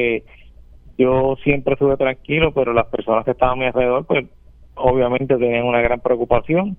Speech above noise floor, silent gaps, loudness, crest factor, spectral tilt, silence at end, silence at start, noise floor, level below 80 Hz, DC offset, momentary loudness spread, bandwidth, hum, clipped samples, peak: 25 dB; none; -18 LUFS; 18 dB; -10 dB/octave; 0.05 s; 0 s; -43 dBFS; -36 dBFS; under 0.1%; 4 LU; 3.8 kHz; none; under 0.1%; 0 dBFS